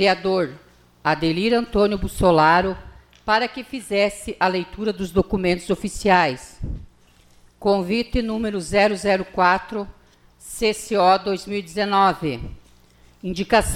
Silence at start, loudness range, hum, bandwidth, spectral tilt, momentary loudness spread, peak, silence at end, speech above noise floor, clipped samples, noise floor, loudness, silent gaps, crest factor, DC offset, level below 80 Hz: 0 s; 3 LU; 60 Hz at -50 dBFS; 16 kHz; -5 dB/octave; 15 LU; -4 dBFS; 0 s; 33 dB; under 0.1%; -53 dBFS; -21 LUFS; none; 18 dB; under 0.1%; -40 dBFS